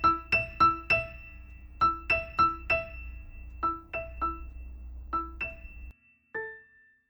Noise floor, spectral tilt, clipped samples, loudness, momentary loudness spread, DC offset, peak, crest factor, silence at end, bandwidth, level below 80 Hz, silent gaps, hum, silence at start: -60 dBFS; -6 dB/octave; under 0.1%; -29 LUFS; 23 LU; under 0.1%; -12 dBFS; 20 dB; 0.5 s; over 20 kHz; -46 dBFS; none; none; 0 s